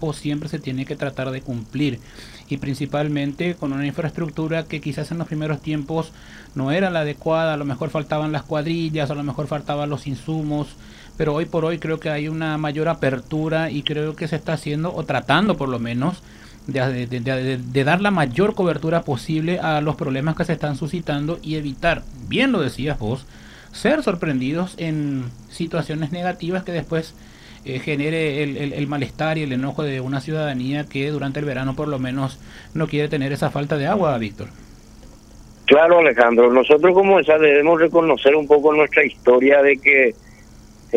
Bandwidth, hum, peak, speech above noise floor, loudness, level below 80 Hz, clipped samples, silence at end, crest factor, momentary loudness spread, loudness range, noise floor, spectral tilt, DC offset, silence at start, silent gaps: 14.5 kHz; none; 0 dBFS; 24 dB; -20 LUFS; -46 dBFS; under 0.1%; 0 s; 20 dB; 14 LU; 11 LU; -44 dBFS; -7 dB/octave; under 0.1%; 0 s; none